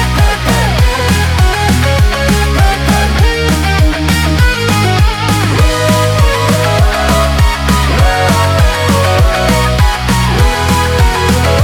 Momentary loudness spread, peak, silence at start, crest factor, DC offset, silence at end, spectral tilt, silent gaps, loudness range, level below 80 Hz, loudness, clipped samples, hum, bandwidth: 1 LU; 0 dBFS; 0 s; 10 dB; under 0.1%; 0 s; -5 dB/octave; none; 0 LU; -14 dBFS; -10 LUFS; under 0.1%; none; 18.5 kHz